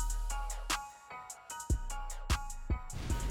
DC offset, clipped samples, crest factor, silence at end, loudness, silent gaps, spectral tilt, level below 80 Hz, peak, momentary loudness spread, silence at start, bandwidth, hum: under 0.1%; under 0.1%; 16 dB; 0 s; -39 LUFS; none; -3.5 dB/octave; -38 dBFS; -20 dBFS; 10 LU; 0 s; 17 kHz; none